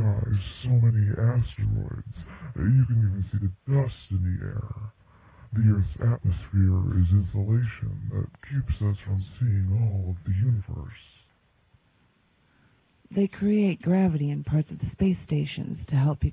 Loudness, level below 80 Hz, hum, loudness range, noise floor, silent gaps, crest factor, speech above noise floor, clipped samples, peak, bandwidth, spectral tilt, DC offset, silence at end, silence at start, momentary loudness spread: -26 LUFS; -38 dBFS; none; 5 LU; -65 dBFS; none; 14 dB; 40 dB; under 0.1%; -12 dBFS; 4 kHz; -12.5 dB/octave; under 0.1%; 0 s; 0 s; 11 LU